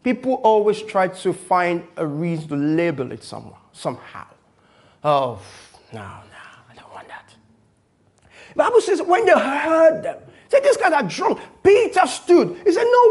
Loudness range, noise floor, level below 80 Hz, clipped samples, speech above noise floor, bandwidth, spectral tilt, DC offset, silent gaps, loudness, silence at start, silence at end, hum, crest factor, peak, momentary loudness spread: 11 LU; -60 dBFS; -62 dBFS; under 0.1%; 42 dB; 11.5 kHz; -5.5 dB/octave; under 0.1%; none; -18 LUFS; 0.05 s; 0 s; none; 18 dB; -2 dBFS; 22 LU